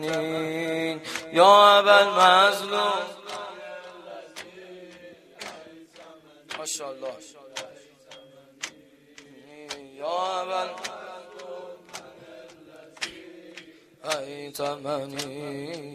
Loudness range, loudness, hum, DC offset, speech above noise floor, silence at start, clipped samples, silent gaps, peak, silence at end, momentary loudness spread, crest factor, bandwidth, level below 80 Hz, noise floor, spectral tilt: 21 LU; -22 LUFS; none; under 0.1%; 30 dB; 0 s; under 0.1%; none; -2 dBFS; 0 s; 26 LU; 24 dB; 15 kHz; -74 dBFS; -53 dBFS; -2.5 dB/octave